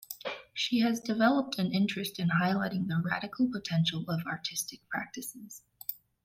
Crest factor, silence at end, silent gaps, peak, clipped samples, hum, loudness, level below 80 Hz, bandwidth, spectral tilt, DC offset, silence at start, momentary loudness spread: 18 dB; 0.3 s; none; -14 dBFS; under 0.1%; none; -31 LUFS; -70 dBFS; 16.5 kHz; -5 dB/octave; under 0.1%; 0.1 s; 12 LU